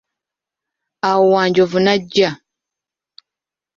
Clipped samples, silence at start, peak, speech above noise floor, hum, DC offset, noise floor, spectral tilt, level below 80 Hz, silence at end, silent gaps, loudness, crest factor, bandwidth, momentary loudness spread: under 0.1%; 1.05 s; -2 dBFS; 73 dB; none; under 0.1%; -87 dBFS; -5.5 dB/octave; -60 dBFS; 1.45 s; none; -15 LUFS; 16 dB; 7.4 kHz; 7 LU